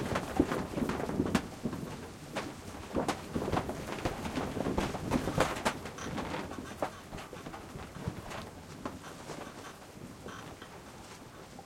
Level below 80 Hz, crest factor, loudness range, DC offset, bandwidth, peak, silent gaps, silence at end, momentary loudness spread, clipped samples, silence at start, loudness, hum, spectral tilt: -52 dBFS; 30 dB; 10 LU; under 0.1%; 16.5 kHz; -8 dBFS; none; 0 s; 15 LU; under 0.1%; 0 s; -37 LUFS; none; -5 dB/octave